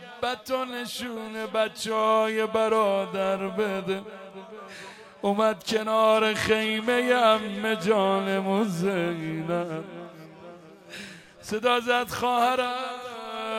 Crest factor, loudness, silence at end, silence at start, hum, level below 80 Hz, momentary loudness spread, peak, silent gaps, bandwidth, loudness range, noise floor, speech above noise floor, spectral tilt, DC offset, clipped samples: 18 dB; -25 LUFS; 0 s; 0 s; none; -66 dBFS; 20 LU; -8 dBFS; none; 16.5 kHz; 6 LU; -46 dBFS; 21 dB; -4.5 dB/octave; under 0.1%; under 0.1%